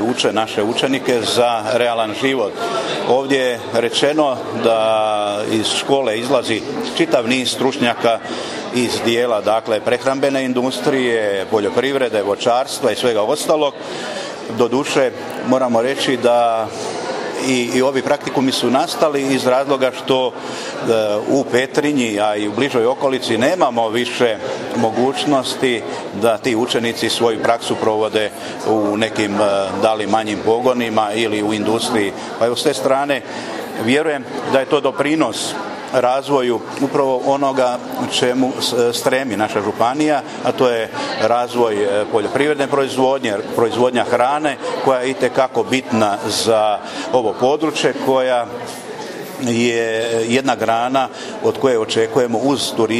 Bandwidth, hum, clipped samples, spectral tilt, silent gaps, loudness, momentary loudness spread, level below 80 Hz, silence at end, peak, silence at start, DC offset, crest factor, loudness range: 15 kHz; none; under 0.1%; -4 dB/octave; none; -17 LUFS; 5 LU; -60 dBFS; 0 s; 0 dBFS; 0 s; under 0.1%; 16 dB; 1 LU